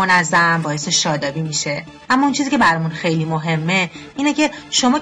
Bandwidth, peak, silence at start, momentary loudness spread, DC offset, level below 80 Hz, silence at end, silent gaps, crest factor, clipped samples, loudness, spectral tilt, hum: 10.5 kHz; -6 dBFS; 0 s; 7 LU; under 0.1%; -52 dBFS; 0 s; none; 12 dB; under 0.1%; -17 LUFS; -3.5 dB/octave; none